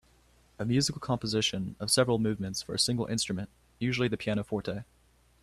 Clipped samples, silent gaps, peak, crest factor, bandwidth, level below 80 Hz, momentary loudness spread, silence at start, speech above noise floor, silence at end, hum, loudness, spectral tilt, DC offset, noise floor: under 0.1%; none; -12 dBFS; 20 dB; 13.5 kHz; -58 dBFS; 10 LU; 0.6 s; 33 dB; 0.6 s; none; -30 LUFS; -4 dB/octave; under 0.1%; -63 dBFS